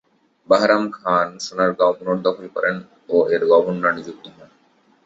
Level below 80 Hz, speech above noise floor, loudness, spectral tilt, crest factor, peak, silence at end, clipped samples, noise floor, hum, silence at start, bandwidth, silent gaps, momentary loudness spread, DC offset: -64 dBFS; 39 dB; -19 LUFS; -5 dB/octave; 20 dB; 0 dBFS; 0.75 s; under 0.1%; -58 dBFS; none; 0.5 s; 7.8 kHz; none; 10 LU; under 0.1%